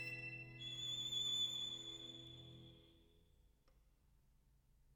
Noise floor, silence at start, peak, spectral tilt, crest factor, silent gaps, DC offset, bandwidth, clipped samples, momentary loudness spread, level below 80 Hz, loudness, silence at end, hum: -74 dBFS; 0 s; -32 dBFS; -1.5 dB/octave; 18 dB; none; under 0.1%; over 20 kHz; under 0.1%; 20 LU; -74 dBFS; -43 LUFS; 0 s; none